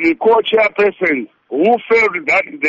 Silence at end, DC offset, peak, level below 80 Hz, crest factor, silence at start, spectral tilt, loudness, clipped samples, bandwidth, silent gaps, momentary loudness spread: 0 s; under 0.1%; -4 dBFS; -54 dBFS; 12 dB; 0 s; -5 dB/octave; -14 LUFS; under 0.1%; 7.6 kHz; none; 5 LU